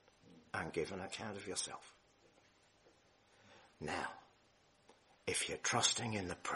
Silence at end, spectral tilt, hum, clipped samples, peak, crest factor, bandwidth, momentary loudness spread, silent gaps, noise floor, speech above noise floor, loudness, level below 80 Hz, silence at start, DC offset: 0 s; -2 dB/octave; none; under 0.1%; -18 dBFS; 28 dB; 11.5 kHz; 14 LU; none; -71 dBFS; 30 dB; -40 LUFS; -72 dBFS; 0.25 s; under 0.1%